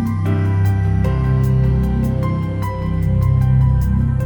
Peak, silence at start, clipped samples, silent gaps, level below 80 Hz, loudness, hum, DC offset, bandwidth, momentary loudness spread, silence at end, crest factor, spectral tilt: -4 dBFS; 0 s; under 0.1%; none; -22 dBFS; -17 LUFS; none; under 0.1%; 19.5 kHz; 5 LU; 0 s; 10 dB; -9.5 dB/octave